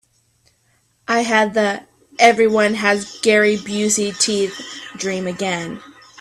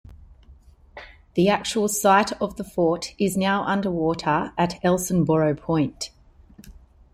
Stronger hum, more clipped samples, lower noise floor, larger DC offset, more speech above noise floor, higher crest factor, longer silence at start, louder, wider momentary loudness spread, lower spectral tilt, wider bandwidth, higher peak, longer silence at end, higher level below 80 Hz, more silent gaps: neither; neither; first, -61 dBFS vs -50 dBFS; neither; first, 44 dB vs 28 dB; about the same, 18 dB vs 18 dB; first, 1.1 s vs 0.1 s; first, -17 LUFS vs -22 LUFS; first, 17 LU vs 10 LU; second, -3 dB/octave vs -5 dB/octave; second, 14 kHz vs 16.5 kHz; first, 0 dBFS vs -4 dBFS; about the same, 0.35 s vs 0.45 s; second, -60 dBFS vs -50 dBFS; neither